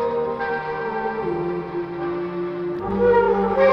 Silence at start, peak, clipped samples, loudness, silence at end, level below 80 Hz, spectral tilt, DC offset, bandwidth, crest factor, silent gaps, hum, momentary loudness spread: 0 s; -4 dBFS; under 0.1%; -23 LUFS; 0 s; -48 dBFS; -8.5 dB/octave; under 0.1%; 6 kHz; 16 dB; none; none; 10 LU